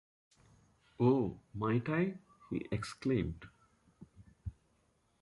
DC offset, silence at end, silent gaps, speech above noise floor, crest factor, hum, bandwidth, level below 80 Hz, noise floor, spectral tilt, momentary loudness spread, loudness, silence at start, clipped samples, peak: under 0.1%; 0.7 s; none; 40 dB; 20 dB; none; 11.5 kHz; -58 dBFS; -74 dBFS; -8 dB/octave; 19 LU; -35 LUFS; 1 s; under 0.1%; -18 dBFS